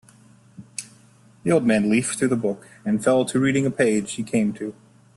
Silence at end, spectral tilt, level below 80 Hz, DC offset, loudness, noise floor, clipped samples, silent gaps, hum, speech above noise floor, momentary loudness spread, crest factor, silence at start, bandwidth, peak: 0.45 s; -5.5 dB/octave; -60 dBFS; under 0.1%; -22 LUFS; -53 dBFS; under 0.1%; none; none; 32 dB; 15 LU; 16 dB; 0.6 s; 12.5 kHz; -6 dBFS